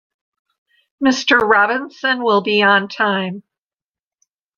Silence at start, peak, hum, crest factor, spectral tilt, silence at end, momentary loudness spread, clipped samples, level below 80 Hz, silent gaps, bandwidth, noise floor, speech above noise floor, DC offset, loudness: 1 s; -2 dBFS; none; 16 dB; -4 dB/octave; 1.2 s; 8 LU; under 0.1%; -60 dBFS; none; 7.4 kHz; under -90 dBFS; over 74 dB; under 0.1%; -15 LUFS